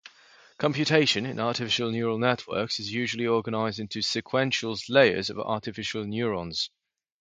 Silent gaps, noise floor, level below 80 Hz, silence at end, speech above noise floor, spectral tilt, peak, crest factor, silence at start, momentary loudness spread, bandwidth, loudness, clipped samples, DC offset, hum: none; -56 dBFS; -62 dBFS; 0.55 s; 30 dB; -4.5 dB/octave; -4 dBFS; 24 dB; 0.05 s; 9 LU; 9.4 kHz; -26 LUFS; under 0.1%; under 0.1%; none